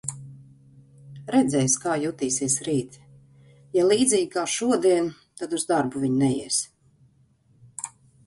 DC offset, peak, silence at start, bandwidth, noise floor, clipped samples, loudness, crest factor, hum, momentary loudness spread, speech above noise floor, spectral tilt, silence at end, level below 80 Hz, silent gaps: under 0.1%; -8 dBFS; 0.05 s; 11.5 kHz; -61 dBFS; under 0.1%; -23 LUFS; 18 dB; none; 16 LU; 38 dB; -4 dB/octave; 0.4 s; -62 dBFS; none